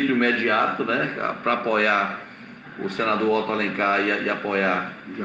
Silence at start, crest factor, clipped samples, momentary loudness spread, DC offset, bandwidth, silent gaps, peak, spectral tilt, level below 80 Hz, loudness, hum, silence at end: 0 s; 16 dB; under 0.1%; 13 LU; under 0.1%; 7.8 kHz; none; -6 dBFS; -6 dB/octave; -68 dBFS; -22 LUFS; none; 0 s